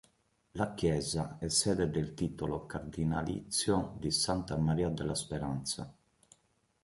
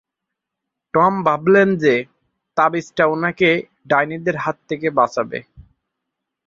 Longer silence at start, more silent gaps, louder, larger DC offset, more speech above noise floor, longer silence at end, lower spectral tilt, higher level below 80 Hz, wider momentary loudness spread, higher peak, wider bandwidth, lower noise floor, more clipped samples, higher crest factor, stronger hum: second, 0.55 s vs 0.95 s; neither; second, -34 LUFS vs -18 LUFS; neither; second, 40 dB vs 64 dB; about the same, 0.9 s vs 0.85 s; second, -4.5 dB/octave vs -6.5 dB/octave; first, -52 dBFS vs -58 dBFS; about the same, 8 LU vs 10 LU; second, -14 dBFS vs 0 dBFS; first, 12 kHz vs 7.6 kHz; second, -74 dBFS vs -82 dBFS; neither; about the same, 20 dB vs 18 dB; neither